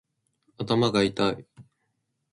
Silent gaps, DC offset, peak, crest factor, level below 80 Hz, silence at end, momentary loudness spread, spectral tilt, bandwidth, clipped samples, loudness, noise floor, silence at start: none; under 0.1%; -10 dBFS; 20 dB; -60 dBFS; 0.7 s; 15 LU; -6 dB/octave; 11 kHz; under 0.1%; -25 LUFS; -77 dBFS; 0.6 s